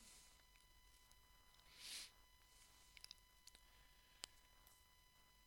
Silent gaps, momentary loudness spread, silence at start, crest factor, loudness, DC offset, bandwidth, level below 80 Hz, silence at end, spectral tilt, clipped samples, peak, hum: none; 16 LU; 0 s; 36 dB; -61 LUFS; under 0.1%; 17 kHz; -76 dBFS; 0 s; 0 dB/octave; under 0.1%; -30 dBFS; none